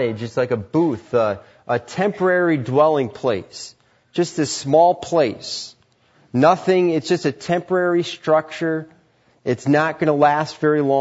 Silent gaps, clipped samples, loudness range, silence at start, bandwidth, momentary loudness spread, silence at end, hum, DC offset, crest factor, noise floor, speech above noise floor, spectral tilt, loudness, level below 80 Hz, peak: none; under 0.1%; 2 LU; 0 s; 8 kHz; 12 LU; 0 s; none; under 0.1%; 16 dB; -57 dBFS; 38 dB; -5.5 dB/octave; -19 LUFS; -62 dBFS; -2 dBFS